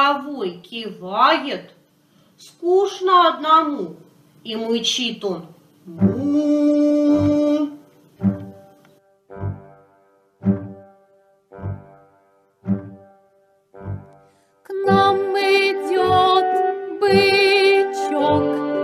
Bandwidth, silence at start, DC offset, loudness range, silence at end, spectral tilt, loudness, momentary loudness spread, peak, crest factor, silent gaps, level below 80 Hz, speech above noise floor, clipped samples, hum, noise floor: 13.5 kHz; 0 s; under 0.1%; 14 LU; 0 s; -5.5 dB/octave; -18 LUFS; 18 LU; -2 dBFS; 18 dB; none; -58 dBFS; 40 dB; under 0.1%; none; -59 dBFS